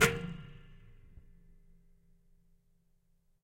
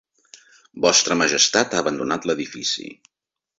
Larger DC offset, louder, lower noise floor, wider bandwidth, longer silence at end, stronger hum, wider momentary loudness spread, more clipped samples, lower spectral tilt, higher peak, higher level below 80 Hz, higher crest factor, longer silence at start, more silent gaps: neither; second, -35 LUFS vs -19 LUFS; first, -71 dBFS vs -51 dBFS; first, 16 kHz vs 8 kHz; first, 2.35 s vs 0.65 s; neither; first, 26 LU vs 9 LU; neither; first, -3.5 dB/octave vs -1.5 dB/octave; second, -8 dBFS vs -2 dBFS; first, -56 dBFS vs -62 dBFS; first, 32 dB vs 20 dB; second, 0 s vs 0.75 s; neither